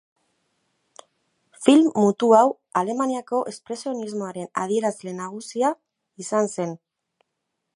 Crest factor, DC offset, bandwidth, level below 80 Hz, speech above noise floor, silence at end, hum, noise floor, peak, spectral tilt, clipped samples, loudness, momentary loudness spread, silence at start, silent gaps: 22 dB; under 0.1%; 11.5 kHz; -76 dBFS; 58 dB; 1 s; none; -79 dBFS; 0 dBFS; -5.5 dB/octave; under 0.1%; -22 LUFS; 16 LU; 1.6 s; none